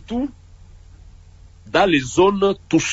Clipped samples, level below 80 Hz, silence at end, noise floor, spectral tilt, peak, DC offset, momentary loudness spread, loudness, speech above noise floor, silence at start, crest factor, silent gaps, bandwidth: under 0.1%; -44 dBFS; 0 s; -45 dBFS; -4.5 dB/octave; -4 dBFS; under 0.1%; 10 LU; -18 LUFS; 27 dB; 0.1 s; 16 dB; none; 8 kHz